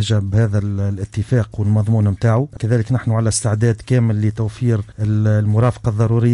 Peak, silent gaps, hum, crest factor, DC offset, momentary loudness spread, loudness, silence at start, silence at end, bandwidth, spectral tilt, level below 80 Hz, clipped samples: -4 dBFS; none; none; 12 dB; under 0.1%; 5 LU; -18 LUFS; 0 s; 0 s; 11 kHz; -7 dB/octave; -40 dBFS; under 0.1%